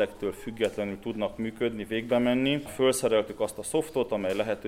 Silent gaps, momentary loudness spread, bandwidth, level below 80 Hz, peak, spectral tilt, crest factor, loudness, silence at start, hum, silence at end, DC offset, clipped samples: none; 8 LU; 16 kHz; -56 dBFS; -12 dBFS; -4.5 dB/octave; 16 dB; -28 LUFS; 0 s; none; 0 s; under 0.1%; under 0.1%